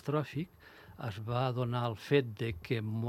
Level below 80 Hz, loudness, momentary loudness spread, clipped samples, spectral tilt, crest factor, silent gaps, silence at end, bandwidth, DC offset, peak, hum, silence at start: -62 dBFS; -35 LUFS; 12 LU; under 0.1%; -7.5 dB/octave; 20 dB; none; 0 s; 14 kHz; under 0.1%; -14 dBFS; none; 0.05 s